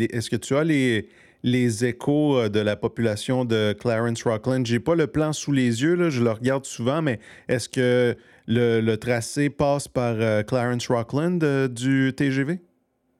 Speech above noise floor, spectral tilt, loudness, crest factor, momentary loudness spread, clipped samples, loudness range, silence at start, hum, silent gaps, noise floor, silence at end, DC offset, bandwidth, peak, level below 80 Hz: 46 dB; -6 dB/octave; -23 LUFS; 14 dB; 5 LU; under 0.1%; 1 LU; 0 s; none; none; -68 dBFS; 0.6 s; under 0.1%; 14 kHz; -8 dBFS; -56 dBFS